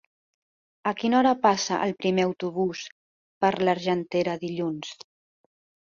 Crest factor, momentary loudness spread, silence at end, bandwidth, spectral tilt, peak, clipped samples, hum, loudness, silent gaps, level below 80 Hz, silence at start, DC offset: 20 dB; 14 LU; 0.9 s; 7.4 kHz; -5 dB/octave; -6 dBFS; under 0.1%; none; -25 LUFS; 2.92-3.41 s; -68 dBFS; 0.85 s; under 0.1%